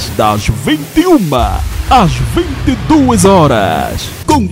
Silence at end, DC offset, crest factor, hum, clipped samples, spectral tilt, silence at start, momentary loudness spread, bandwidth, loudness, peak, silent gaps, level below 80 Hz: 0 s; under 0.1%; 10 dB; none; 0.3%; -5.5 dB/octave; 0 s; 8 LU; 16.5 kHz; -11 LUFS; 0 dBFS; none; -22 dBFS